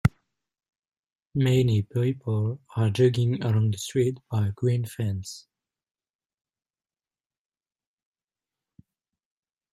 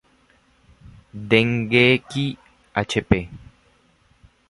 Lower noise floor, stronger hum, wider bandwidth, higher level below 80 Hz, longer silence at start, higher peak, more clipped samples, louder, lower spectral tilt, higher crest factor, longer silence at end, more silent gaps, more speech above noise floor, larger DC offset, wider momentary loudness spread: first, under -90 dBFS vs -59 dBFS; neither; first, 13 kHz vs 11.5 kHz; second, -56 dBFS vs -46 dBFS; second, 0.05 s vs 1.15 s; second, -6 dBFS vs -2 dBFS; neither; second, -26 LUFS vs -20 LUFS; about the same, -7 dB/octave vs -6 dB/octave; about the same, 22 dB vs 22 dB; first, 4.3 s vs 1.15 s; first, 0.78-0.82 s, 0.99-1.03 s vs none; first, over 66 dB vs 40 dB; neither; second, 9 LU vs 22 LU